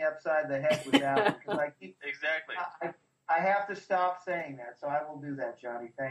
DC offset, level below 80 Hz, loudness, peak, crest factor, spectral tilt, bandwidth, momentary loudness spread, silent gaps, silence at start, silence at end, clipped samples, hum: under 0.1%; -76 dBFS; -31 LUFS; -8 dBFS; 24 dB; -5 dB/octave; 13 kHz; 14 LU; none; 0 s; 0 s; under 0.1%; none